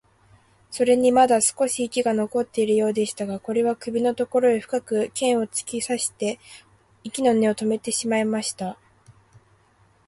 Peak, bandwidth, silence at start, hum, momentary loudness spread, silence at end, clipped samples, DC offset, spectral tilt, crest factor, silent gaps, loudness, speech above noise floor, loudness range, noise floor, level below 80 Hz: -4 dBFS; 11.5 kHz; 0.7 s; none; 11 LU; 0.95 s; under 0.1%; under 0.1%; -3.5 dB/octave; 18 dB; none; -22 LUFS; 37 dB; 4 LU; -60 dBFS; -64 dBFS